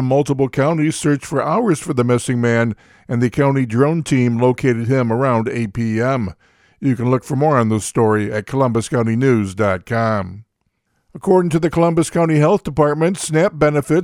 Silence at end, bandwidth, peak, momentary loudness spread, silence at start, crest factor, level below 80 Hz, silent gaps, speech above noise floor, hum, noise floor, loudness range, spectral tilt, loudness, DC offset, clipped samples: 0 s; 14.5 kHz; 0 dBFS; 5 LU; 0 s; 16 dB; -48 dBFS; none; 52 dB; none; -69 dBFS; 2 LU; -6.5 dB/octave; -17 LUFS; under 0.1%; under 0.1%